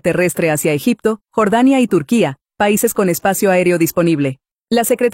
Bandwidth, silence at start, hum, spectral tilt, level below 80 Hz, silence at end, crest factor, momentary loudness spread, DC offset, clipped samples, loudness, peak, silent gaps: 16.5 kHz; 0.05 s; none; -5 dB/octave; -52 dBFS; 0 s; 14 dB; 6 LU; under 0.1%; under 0.1%; -15 LUFS; -2 dBFS; 4.51-4.56 s